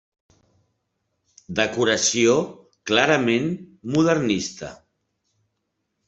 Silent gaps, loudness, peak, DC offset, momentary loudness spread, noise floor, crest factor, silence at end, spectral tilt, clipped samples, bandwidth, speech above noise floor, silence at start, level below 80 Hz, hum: none; -21 LUFS; -2 dBFS; under 0.1%; 16 LU; -76 dBFS; 22 dB; 1.35 s; -3.5 dB/octave; under 0.1%; 8.2 kHz; 56 dB; 1.5 s; -60 dBFS; none